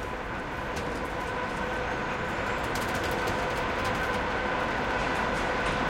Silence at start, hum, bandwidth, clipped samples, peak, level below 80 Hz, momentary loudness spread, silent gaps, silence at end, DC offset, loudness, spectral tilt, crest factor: 0 s; none; 17 kHz; under 0.1%; -16 dBFS; -42 dBFS; 5 LU; none; 0 s; under 0.1%; -30 LUFS; -4.5 dB/octave; 14 dB